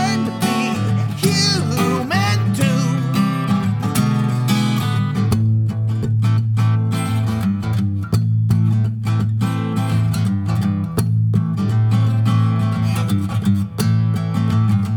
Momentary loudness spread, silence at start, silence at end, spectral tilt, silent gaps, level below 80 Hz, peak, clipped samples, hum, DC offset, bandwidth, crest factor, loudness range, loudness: 3 LU; 0 s; 0 s; -6 dB/octave; none; -44 dBFS; -2 dBFS; under 0.1%; none; under 0.1%; 18 kHz; 14 dB; 1 LU; -18 LUFS